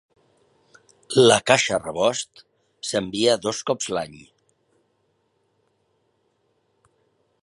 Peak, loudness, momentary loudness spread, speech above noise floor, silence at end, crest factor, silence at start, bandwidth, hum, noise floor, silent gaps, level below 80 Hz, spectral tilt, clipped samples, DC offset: 0 dBFS; -21 LUFS; 15 LU; 48 dB; 3.25 s; 26 dB; 1.1 s; 11.5 kHz; none; -69 dBFS; none; -62 dBFS; -3 dB/octave; under 0.1%; under 0.1%